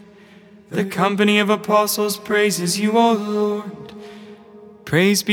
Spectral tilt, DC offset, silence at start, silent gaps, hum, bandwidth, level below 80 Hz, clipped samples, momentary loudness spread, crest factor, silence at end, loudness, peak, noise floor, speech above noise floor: -4 dB/octave; under 0.1%; 0.7 s; none; none; over 20 kHz; -64 dBFS; under 0.1%; 20 LU; 18 dB; 0 s; -18 LUFS; -2 dBFS; -46 dBFS; 28 dB